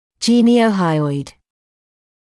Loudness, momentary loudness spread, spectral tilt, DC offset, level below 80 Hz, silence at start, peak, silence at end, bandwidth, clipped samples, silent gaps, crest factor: -15 LUFS; 13 LU; -6 dB/octave; under 0.1%; -60 dBFS; 0.2 s; -4 dBFS; 1 s; 12 kHz; under 0.1%; none; 14 dB